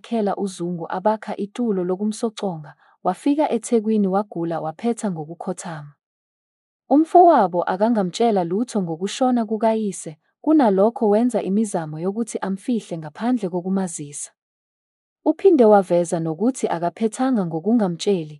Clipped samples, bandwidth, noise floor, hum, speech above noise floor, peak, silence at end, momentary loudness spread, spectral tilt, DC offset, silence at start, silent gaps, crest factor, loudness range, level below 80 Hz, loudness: under 0.1%; 12 kHz; under -90 dBFS; none; over 70 dB; -2 dBFS; 0 s; 13 LU; -6.5 dB/octave; under 0.1%; 0.05 s; 6.06-6.80 s, 14.42-15.16 s; 18 dB; 6 LU; -74 dBFS; -20 LUFS